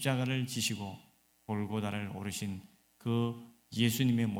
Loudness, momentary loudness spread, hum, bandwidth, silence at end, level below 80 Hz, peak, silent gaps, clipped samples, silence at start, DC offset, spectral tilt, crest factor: -34 LUFS; 16 LU; none; 17 kHz; 0 s; -70 dBFS; -14 dBFS; none; under 0.1%; 0 s; under 0.1%; -5 dB/octave; 20 dB